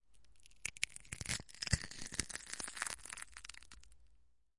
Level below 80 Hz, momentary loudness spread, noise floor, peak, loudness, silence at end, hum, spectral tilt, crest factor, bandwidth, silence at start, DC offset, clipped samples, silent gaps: -56 dBFS; 14 LU; -71 dBFS; -12 dBFS; -42 LUFS; 0 s; none; -2 dB/octave; 34 dB; 11.5 kHz; 0 s; 0.1%; under 0.1%; none